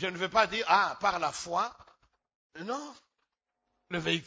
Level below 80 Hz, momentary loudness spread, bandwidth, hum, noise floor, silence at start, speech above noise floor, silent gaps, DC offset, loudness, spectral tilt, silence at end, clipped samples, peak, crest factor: -66 dBFS; 13 LU; 8 kHz; none; -84 dBFS; 0 s; 53 dB; 2.35-2.50 s; under 0.1%; -30 LUFS; -3.5 dB/octave; 0 s; under 0.1%; -10 dBFS; 22 dB